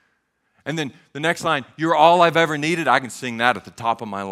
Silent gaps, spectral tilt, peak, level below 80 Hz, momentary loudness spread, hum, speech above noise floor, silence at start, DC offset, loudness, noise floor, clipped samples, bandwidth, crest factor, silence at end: none; -4.5 dB/octave; 0 dBFS; -66 dBFS; 14 LU; none; 49 dB; 0.65 s; under 0.1%; -19 LUFS; -68 dBFS; under 0.1%; 15 kHz; 20 dB; 0 s